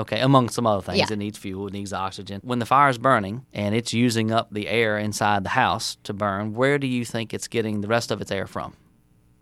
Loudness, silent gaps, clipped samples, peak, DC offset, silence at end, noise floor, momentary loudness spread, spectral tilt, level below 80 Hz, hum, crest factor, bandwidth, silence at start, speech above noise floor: -23 LUFS; none; under 0.1%; -2 dBFS; under 0.1%; 0.7 s; -58 dBFS; 12 LU; -5 dB/octave; -58 dBFS; none; 22 dB; 15.5 kHz; 0 s; 35 dB